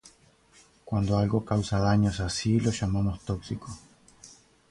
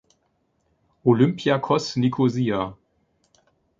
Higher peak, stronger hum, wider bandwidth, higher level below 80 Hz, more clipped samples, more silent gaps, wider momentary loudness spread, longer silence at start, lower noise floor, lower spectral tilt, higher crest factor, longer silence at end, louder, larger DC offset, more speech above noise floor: second, -12 dBFS vs -4 dBFS; neither; first, 11.5 kHz vs 7.6 kHz; first, -44 dBFS vs -60 dBFS; neither; neither; first, 13 LU vs 6 LU; second, 0.05 s vs 1.05 s; second, -59 dBFS vs -69 dBFS; about the same, -6.5 dB/octave vs -7 dB/octave; about the same, 16 dB vs 20 dB; second, 0.45 s vs 1.05 s; second, -27 LUFS vs -22 LUFS; neither; second, 33 dB vs 49 dB